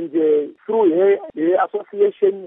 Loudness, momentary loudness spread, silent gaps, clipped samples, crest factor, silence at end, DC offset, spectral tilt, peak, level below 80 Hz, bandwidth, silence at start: -18 LUFS; 6 LU; none; under 0.1%; 12 dB; 0 s; under 0.1%; -5 dB/octave; -6 dBFS; -74 dBFS; 3.7 kHz; 0 s